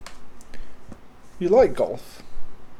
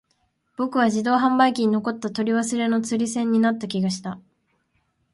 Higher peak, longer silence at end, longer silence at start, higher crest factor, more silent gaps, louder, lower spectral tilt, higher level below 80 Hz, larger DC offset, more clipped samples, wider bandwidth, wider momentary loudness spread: about the same, -6 dBFS vs -4 dBFS; second, 0 s vs 0.95 s; second, 0 s vs 0.6 s; about the same, 18 dB vs 18 dB; neither; about the same, -21 LUFS vs -22 LUFS; first, -6.5 dB/octave vs -5 dB/octave; first, -42 dBFS vs -68 dBFS; neither; neither; first, 13.5 kHz vs 11.5 kHz; first, 27 LU vs 10 LU